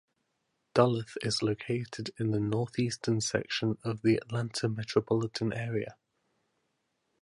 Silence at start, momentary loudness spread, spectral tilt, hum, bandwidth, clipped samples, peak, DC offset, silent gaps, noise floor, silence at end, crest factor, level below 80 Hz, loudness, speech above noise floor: 0.75 s; 7 LU; -5.5 dB/octave; none; 11.5 kHz; under 0.1%; -8 dBFS; under 0.1%; none; -79 dBFS; 1.3 s; 24 dB; -64 dBFS; -31 LUFS; 49 dB